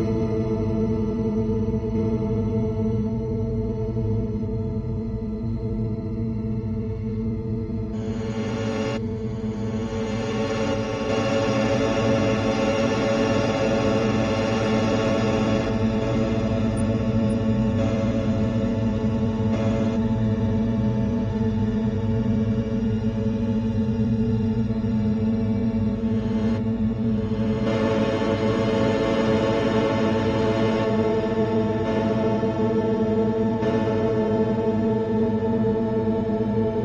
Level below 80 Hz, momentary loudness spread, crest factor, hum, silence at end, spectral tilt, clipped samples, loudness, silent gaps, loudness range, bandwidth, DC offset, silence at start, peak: -38 dBFS; 6 LU; 14 dB; none; 0 s; -7.5 dB/octave; under 0.1%; -23 LUFS; none; 5 LU; 10 kHz; under 0.1%; 0 s; -8 dBFS